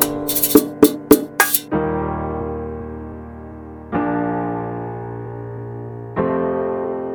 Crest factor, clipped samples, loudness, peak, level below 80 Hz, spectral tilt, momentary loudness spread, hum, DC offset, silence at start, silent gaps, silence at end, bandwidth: 20 dB; 0.2%; -19 LUFS; 0 dBFS; -42 dBFS; -4.5 dB/octave; 18 LU; none; under 0.1%; 0 s; none; 0 s; over 20 kHz